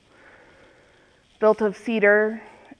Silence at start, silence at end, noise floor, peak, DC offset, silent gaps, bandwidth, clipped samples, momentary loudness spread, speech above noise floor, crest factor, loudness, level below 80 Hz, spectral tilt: 1.4 s; 0.35 s; -57 dBFS; -4 dBFS; under 0.1%; none; 9.8 kHz; under 0.1%; 8 LU; 37 dB; 20 dB; -21 LUFS; -66 dBFS; -6.5 dB/octave